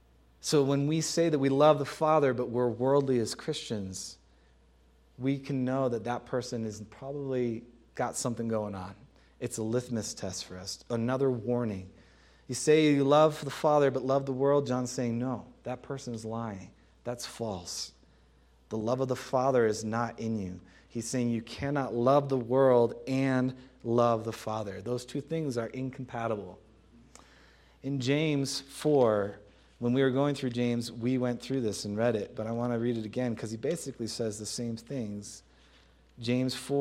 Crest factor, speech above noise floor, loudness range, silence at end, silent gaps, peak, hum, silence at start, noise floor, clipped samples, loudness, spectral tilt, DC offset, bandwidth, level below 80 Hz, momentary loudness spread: 20 dB; 32 dB; 9 LU; 0 s; none; -10 dBFS; none; 0.45 s; -62 dBFS; under 0.1%; -30 LUFS; -5.5 dB/octave; under 0.1%; 15.5 kHz; -64 dBFS; 13 LU